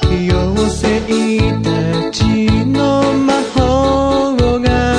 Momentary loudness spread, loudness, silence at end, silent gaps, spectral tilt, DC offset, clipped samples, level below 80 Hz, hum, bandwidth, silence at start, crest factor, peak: 3 LU; -14 LUFS; 0 s; none; -6 dB/octave; under 0.1%; under 0.1%; -24 dBFS; none; 10.5 kHz; 0 s; 12 dB; 0 dBFS